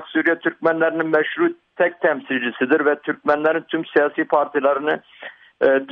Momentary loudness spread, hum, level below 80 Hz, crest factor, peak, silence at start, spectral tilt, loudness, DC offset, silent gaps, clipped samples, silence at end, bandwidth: 5 LU; none; -66 dBFS; 16 dB; -4 dBFS; 0 s; -7.5 dB/octave; -20 LUFS; under 0.1%; none; under 0.1%; 0 s; 5.2 kHz